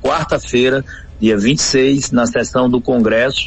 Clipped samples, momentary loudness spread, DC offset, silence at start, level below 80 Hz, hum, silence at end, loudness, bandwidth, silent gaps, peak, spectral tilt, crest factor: under 0.1%; 5 LU; under 0.1%; 0 s; -38 dBFS; none; 0 s; -14 LUFS; 8.6 kHz; none; -2 dBFS; -4.5 dB/octave; 12 dB